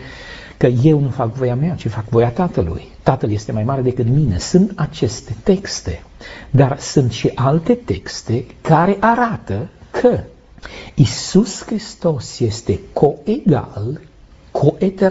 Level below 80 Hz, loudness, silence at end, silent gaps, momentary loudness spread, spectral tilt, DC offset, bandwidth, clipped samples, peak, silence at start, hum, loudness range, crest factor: -38 dBFS; -17 LUFS; 0 s; none; 12 LU; -7 dB/octave; under 0.1%; 8 kHz; under 0.1%; 0 dBFS; 0 s; none; 2 LU; 16 dB